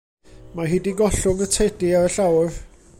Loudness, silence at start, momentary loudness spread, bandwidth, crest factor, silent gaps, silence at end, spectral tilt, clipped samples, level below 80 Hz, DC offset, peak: -20 LUFS; 0.35 s; 9 LU; 16.5 kHz; 14 dB; none; 0.3 s; -5 dB/octave; under 0.1%; -36 dBFS; under 0.1%; -6 dBFS